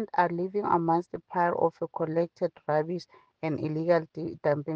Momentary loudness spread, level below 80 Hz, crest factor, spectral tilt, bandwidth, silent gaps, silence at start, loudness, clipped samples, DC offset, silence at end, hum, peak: 8 LU; -72 dBFS; 18 dB; -8.5 dB/octave; 7 kHz; none; 0 s; -29 LUFS; under 0.1%; under 0.1%; 0 s; none; -10 dBFS